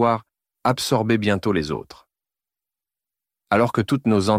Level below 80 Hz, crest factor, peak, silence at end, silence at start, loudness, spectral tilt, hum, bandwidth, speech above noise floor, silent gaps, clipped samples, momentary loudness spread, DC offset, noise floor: -52 dBFS; 16 dB; -6 dBFS; 0 s; 0 s; -21 LUFS; -6 dB/octave; none; 16 kHz; over 70 dB; none; under 0.1%; 7 LU; under 0.1%; under -90 dBFS